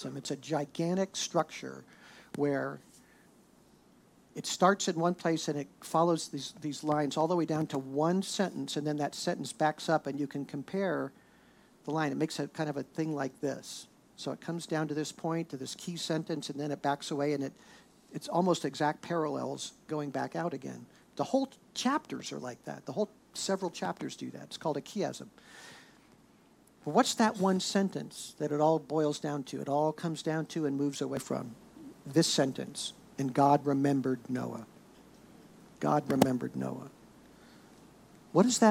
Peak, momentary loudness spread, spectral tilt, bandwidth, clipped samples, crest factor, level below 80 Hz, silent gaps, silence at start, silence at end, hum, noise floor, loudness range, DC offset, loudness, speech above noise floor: -6 dBFS; 14 LU; -5 dB/octave; 16.5 kHz; under 0.1%; 26 dB; -76 dBFS; none; 0 s; 0 s; none; -62 dBFS; 6 LU; under 0.1%; -33 LUFS; 30 dB